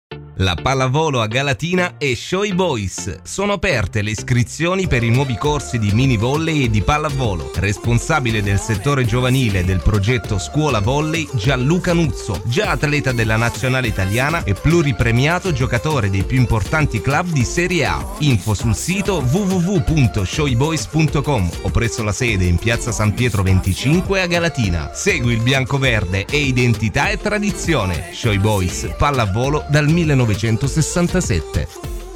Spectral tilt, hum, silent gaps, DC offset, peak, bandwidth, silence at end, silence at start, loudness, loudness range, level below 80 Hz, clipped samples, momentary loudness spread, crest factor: -5.5 dB/octave; none; none; under 0.1%; -4 dBFS; 16.5 kHz; 0 s; 0.1 s; -17 LUFS; 1 LU; -30 dBFS; under 0.1%; 4 LU; 12 dB